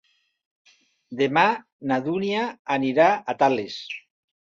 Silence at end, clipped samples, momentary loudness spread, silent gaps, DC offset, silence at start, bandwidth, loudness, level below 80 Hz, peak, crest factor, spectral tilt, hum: 0.6 s; under 0.1%; 14 LU; 1.72-1.79 s, 2.59-2.65 s; under 0.1%; 1.1 s; 7.4 kHz; -23 LUFS; -70 dBFS; -4 dBFS; 20 dB; -5.5 dB/octave; none